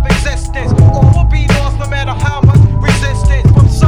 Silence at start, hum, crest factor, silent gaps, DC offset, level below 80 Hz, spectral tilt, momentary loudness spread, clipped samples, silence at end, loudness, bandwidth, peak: 0 s; none; 8 dB; none; under 0.1%; -14 dBFS; -6.5 dB/octave; 8 LU; 2%; 0 s; -11 LUFS; 11.5 kHz; 0 dBFS